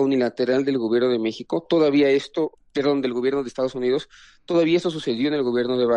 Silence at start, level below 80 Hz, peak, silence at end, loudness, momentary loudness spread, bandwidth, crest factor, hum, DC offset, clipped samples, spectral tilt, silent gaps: 0 s; -62 dBFS; -8 dBFS; 0 s; -22 LUFS; 8 LU; 9.6 kHz; 12 dB; none; under 0.1%; under 0.1%; -6 dB/octave; none